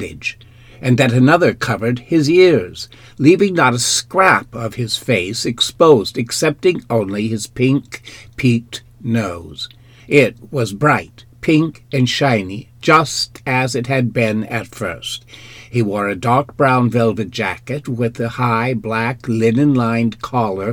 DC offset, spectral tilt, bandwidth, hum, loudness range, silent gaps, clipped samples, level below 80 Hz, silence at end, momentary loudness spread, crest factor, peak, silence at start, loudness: under 0.1%; -5 dB/octave; 18 kHz; none; 5 LU; none; under 0.1%; -48 dBFS; 0 s; 13 LU; 16 dB; 0 dBFS; 0 s; -16 LUFS